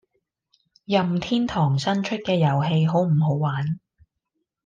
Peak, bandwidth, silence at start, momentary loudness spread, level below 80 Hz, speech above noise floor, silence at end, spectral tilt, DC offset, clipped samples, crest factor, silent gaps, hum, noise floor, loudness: -6 dBFS; 7.6 kHz; 0.9 s; 5 LU; -58 dBFS; 57 dB; 0.85 s; -7.5 dB/octave; under 0.1%; under 0.1%; 16 dB; none; none; -78 dBFS; -22 LUFS